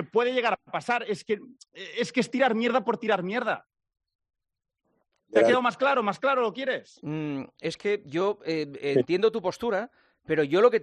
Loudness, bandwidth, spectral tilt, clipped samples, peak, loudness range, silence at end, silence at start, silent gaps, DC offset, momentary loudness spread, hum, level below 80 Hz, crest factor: -27 LUFS; 11 kHz; -5.5 dB/octave; under 0.1%; -6 dBFS; 2 LU; 0 s; 0 s; 4.15-4.19 s; under 0.1%; 11 LU; none; -72 dBFS; 20 dB